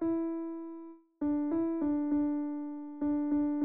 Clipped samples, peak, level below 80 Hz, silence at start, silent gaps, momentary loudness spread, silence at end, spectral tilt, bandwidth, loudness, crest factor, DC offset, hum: under 0.1%; -22 dBFS; -66 dBFS; 0 s; none; 12 LU; 0 s; -9.5 dB/octave; 2.5 kHz; -33 LUFS; 10 dB; 0.2%; none